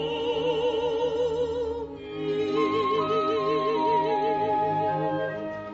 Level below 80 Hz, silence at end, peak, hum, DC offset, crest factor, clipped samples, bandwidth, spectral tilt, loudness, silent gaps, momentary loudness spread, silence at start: -54 dBFS; 0 s; -14 dBFS; none; under 0.1%; 12 dB; under 0.1%; 7.8 kHz; -6 dB/octave; -26 LUFS; none; 7 LU; 0 s